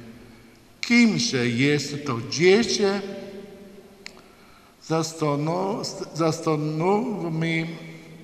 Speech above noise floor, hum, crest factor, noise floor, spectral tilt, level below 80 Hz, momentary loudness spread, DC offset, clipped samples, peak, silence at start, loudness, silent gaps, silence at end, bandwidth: 29 dB; none; 20 dB; -52 dBFS; -5 dB/octave; -62 dBFS; 22 LU; under 0.1%; under 0.1%; -6 dBFS; 0 s; -23 LUFS; none; 0 s; 14.5 kHz